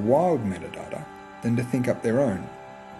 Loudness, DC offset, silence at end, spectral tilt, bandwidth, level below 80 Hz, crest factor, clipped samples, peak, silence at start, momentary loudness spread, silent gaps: -26 LUFS; under 0.1%; 0 s; -7.5 dB/octave; 13.5 kHz; -58 dBFS; 16 dB; under 0.1%; -8 dBFS; 0 s; 17 LU; none